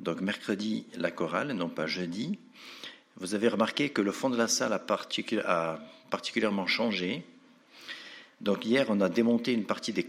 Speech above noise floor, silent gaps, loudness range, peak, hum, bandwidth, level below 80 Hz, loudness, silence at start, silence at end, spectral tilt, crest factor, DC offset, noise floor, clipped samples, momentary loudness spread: 26 dB; none; 3 LU; -10 dBFS; none; 15 kHz; -76 dBFS; -30 LUFS; 0 s; 0 s; -4 dB/octave; 20 dB; under 0.1%; -56 dBFS; under 0.1%; 16 LU